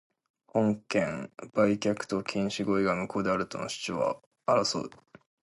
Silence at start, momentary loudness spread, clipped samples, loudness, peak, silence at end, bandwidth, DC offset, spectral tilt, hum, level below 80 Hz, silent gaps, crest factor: 0.55 s; 8 LU; under 0.1%; -30 LUFS; -12 dBFS; 0.55 s; 11.5 kHz; under 0.1%; -5 dB/octave; none; -64 dBFS; 4.26-4.31 s; 18 dB